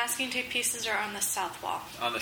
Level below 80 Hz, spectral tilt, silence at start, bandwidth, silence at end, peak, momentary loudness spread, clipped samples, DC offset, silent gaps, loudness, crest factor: -66 dBFS; -0.5 dB/octave; 0 s; over 20 kHz; 0 s; -14 dBFS; 6 LU; under 0.1%; under 0.1%; none; -30 LUFS; 18 dB